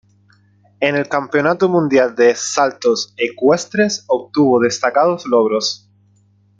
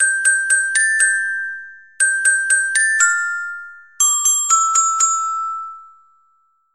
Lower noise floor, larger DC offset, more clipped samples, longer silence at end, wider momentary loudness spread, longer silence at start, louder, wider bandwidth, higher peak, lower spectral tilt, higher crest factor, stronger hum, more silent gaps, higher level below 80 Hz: second, -54 dBFS vs -61 dBFS; second, under 0.1% vs 0.2%; neither; about the same, 0.85 s vs 0.9 s; second, 5 LU vs 13 LU; first, 0.8 s vs 0 s; about the same, -16 LUFS vs -15 LUFS; second, 9.2 kHz vs 15 kHz; about the same, -2 dBFS vs -2 dBFS; first, -4 dB/octave vs 6 dB/octave; about the same, 16 dB vs 16 dB; first, 50 Hz at -45 dBFS vs none; neither; about the same, -62 dBFS vs -66 dBFS